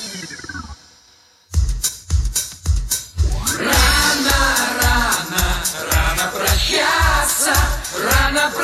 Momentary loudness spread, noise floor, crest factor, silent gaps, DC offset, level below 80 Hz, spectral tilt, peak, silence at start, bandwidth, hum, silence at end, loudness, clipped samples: 9 LU; -51 dBFS; 16 dB; none; under 0.1%; -24 dBFS; -2.5 dB/octave; -2 dBFS; 0 s; 16 kHz; none; 0 s; -17 LUFS; under 0.1%